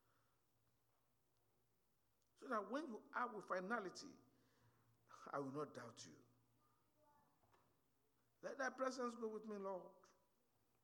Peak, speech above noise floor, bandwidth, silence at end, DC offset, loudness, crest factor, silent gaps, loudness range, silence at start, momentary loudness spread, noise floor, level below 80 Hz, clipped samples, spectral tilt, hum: -30 dBFS; 37 dB; 19 kHz; 0.7 s; under 0.1%; -49 LUFS; 22 dB; none; 6 LU; 2.4 s; 16 LU; -86 dBFS; under -90 dBFS; under 0.1%; -4.5 dB/octave; none